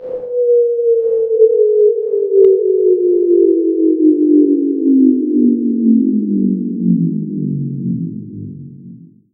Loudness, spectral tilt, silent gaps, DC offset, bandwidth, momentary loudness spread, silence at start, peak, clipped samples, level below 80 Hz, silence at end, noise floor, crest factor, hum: -13 LUFS; -15 dB/octave; none; under 0.1%; 1.3 kHz; 10 LU; 0 s; 0 dBFS; under 0.1%; -64 dBFS; 0.35 s; -37 dBFS; 12 dB; none